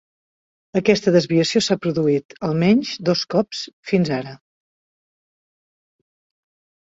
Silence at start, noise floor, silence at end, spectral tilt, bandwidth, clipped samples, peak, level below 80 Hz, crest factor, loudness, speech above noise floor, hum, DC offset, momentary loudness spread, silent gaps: 0.75 s; under -90 dBFS; 2.5 s; -5.5 dB/octave; 8 kHz; under 0.1%; -2 dBFS; -60 dBFS; 20 dB; -19 LUFS; over 71 dB; none; under 0.1%; 9 LU; 2.25-2.29 s, 3.73-3.83 s